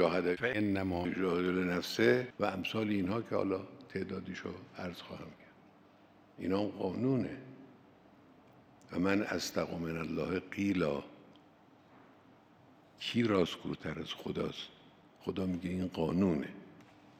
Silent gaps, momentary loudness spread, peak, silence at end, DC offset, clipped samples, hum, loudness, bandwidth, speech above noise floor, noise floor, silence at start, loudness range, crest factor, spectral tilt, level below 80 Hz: none; 13 LU; -14 dBFS; 0.35 s; under 0.1%; under 0.1%; none; -35 LUFS; 16 kHz; 28 dB; -62 dBFS; 0 s; 6 LU; 22 dB; -6 dB/octave; -68 dBFS